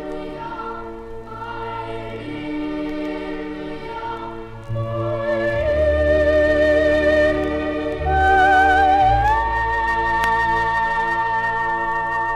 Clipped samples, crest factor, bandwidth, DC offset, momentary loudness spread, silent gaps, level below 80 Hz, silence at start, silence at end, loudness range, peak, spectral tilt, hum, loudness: under 0.1%; 18 dB; 12 kHz; under 0.1%; 16 LU; none; -32 dBFS; 0 s; 0 s; 12 LU; -2 dBFS; -6.5 dB/octave; none; -19 LUFS